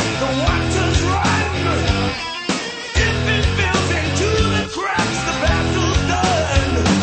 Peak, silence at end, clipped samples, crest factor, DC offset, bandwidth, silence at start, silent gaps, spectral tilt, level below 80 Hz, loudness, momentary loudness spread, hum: -2 dBFS; 0 s; under 0.1%; 16 dB; under 0.1%; 8.8 kHz; 0 s; none; -4.5 dB/octave; -28 dBFS; -18 LUFS; 4 LU; none